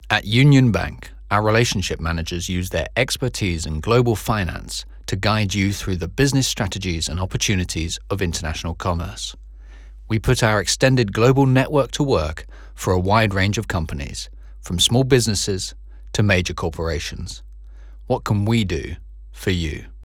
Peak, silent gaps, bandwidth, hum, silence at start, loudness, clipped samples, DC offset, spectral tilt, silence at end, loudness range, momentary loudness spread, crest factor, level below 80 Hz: -2 dBFS; none; 17 kHz; none; 0 s; -20 LUFS; under 0.1%; under 0.1%; -5 dB/octave; 0 s; 5 LU; 13 LU; 18 dB; -36 dBFS